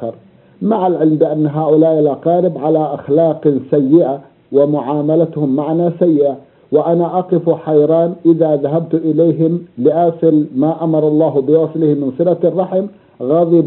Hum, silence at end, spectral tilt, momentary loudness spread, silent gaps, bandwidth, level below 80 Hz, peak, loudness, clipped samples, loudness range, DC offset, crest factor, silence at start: none; 0 s; -10 dB/octave; 5 LU; none; 4.1 kHz; -62 dBFS; 0 dBFS; -14 LUFS; under 0.1%; 1 LU; under 0.1%; 14 dB; 0 s